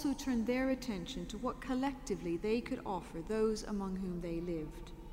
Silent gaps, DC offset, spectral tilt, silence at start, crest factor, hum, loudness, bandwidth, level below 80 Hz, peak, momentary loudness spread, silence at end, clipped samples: none; under 0.1%; -5.5 dB/octave; 0 s; 16 dB; none; -38 LUFS; 16 kHz; -52 dBFS; -22 dBFS; 7 LU; 0 s; under 0.1%